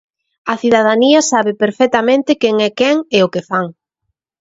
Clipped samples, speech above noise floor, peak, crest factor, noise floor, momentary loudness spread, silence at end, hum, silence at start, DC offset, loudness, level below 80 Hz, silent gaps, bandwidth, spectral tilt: under 0.1%; 60 dB; 0 dBFS; 14 dB; -73 dBFS; 9 LU; 0.7 s; none; 0.45 s; under 0.1%; -13 LUFS; -58 dBFS; none; 8 kHz; -4 dB/octave